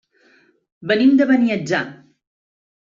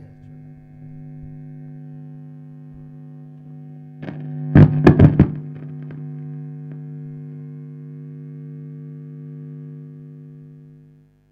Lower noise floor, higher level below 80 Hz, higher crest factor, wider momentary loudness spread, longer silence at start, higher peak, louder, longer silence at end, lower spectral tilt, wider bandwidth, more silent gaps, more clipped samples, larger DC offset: first, -56 dBFS vs -51 dBFS; second, -66 dBFS vs -40 dBFS; second, 16 dB vs 22 dB; second, 16 LU vs 27 LU; first, 0.8 s vs 0 s; second, -4 dBFS vs 0 dBFS; about the same, -17 LUFS vs -16 LUFS; first, 1 s vs 0.6 s; second, -6 dB/octave vs -10.5 dB/octave; first, 7.4 kHz vs 5.4 kHz; neither; neither; neither